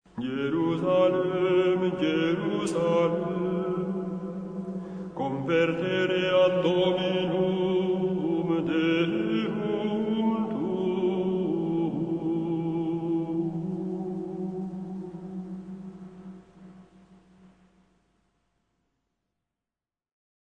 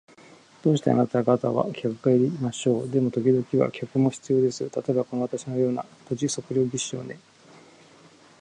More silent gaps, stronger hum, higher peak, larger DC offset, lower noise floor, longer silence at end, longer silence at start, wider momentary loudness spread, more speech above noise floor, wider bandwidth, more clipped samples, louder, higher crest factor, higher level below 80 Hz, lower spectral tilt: neither; neither; second, -10 dBFS vs -6 dBFS; neither; first, under -90 dBFS vs -53 dBFS; first, 3.7 s vs 1.2 s; second, 0.15 s vs 0.65 s; first, 13 LU vs 8 LU; first, over 66 dB vs 29 dB; about the same, 10 kHz vs 10.5 kHz; neither; about the same, -27 LUFS vs -25 LUFS; about the same, 16 dB vs 20 dB; about the same, -62 dBFS vs -66 dBFS; about the same, -7 dB/octave vs -6.5 dB/octave